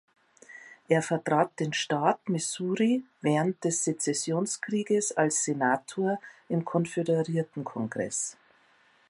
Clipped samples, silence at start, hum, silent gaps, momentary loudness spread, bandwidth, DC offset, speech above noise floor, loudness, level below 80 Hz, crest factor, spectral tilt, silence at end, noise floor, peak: under 0.1%; 0.5 s; none; none; 7 LU; 11.5 kHz; under 0.1%; 35 dB; -28 LUFS; -76 dBFS; 20 dB; -4.5 dB/octave; 0.8 s; -63 dBFS; -8 dBFS